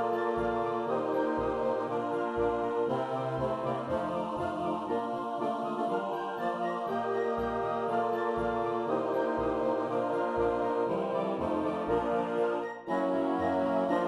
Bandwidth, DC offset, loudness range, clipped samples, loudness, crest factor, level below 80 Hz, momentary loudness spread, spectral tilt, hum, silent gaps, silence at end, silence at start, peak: 11.5 kHz; under 0.1%; 2 LU; under 0.1%; -31 LUFS; 16 dB; -56 dBFS; 3 LU; -7.5 dB/octave; none; none; 0 s; 0 s; -16 dBFS